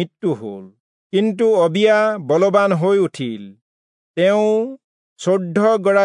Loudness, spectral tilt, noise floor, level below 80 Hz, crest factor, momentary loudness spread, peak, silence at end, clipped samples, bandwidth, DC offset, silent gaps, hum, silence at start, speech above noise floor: -17 LUFS; -6.5 dB/octave; under -90 dBFS; -76 dBFS; 16 dB; 13 LU; -2 dBFS; 0 s; under 0.1%; 10.5 kHz; under 0.1%; 0.80-1.10 s, 3.61-4.14 s, 4.84-5.16 s; none; 0 s; over 74 dB